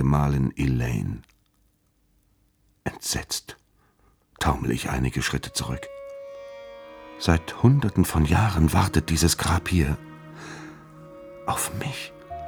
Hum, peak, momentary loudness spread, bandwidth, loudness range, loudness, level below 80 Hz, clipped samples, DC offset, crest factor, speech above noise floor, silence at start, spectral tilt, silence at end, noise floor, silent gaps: none; -4 dBFS; 21 LU; over 20 kHz; 9 LU; -24 LUFS; -36 dBFS; under 0.1%; under 0.1%; 22 dB; 43 dB; 0 s; -5 dB/octave; 0 s; -66 dBFS; none